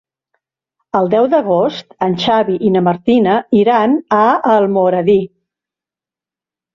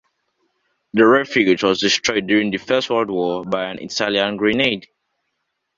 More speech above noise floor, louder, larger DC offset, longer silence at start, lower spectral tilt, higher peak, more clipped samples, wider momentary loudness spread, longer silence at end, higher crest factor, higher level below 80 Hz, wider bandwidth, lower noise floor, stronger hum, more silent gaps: first, 76 dB vs 57 dB; first, -13 LUFS vs -18 LUFS; neither; about the same, 0.95 s vs 0.95 s; first, -7.5 dB/octave vs -4 dB/octave; about the same, -2 dBFS vs 0 dBFS; neither; second, 6 LU vs 10 LU; first, 1.5 s vs 0.95 s; second, 12 dB vs 18 dB; about the same, -56 dBFS vs -56 dBFS; about the same, 7.2 kHz vs 7.6 kHz; first, -89 dBFS vs -74 dBFS; neither; neither